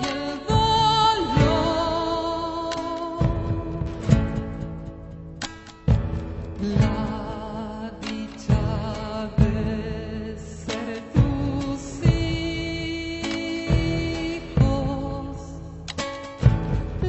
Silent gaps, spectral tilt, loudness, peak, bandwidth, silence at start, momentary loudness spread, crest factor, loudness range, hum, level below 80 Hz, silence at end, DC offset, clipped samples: none; -6.5 dB/octave; -25 LUFS; -2 dBFS; 8.4 kHz; 0 s; 13 LU; 22 dB; 5 LU; none; -32 dBFS; 0 s; under 0.1%; under 0.1%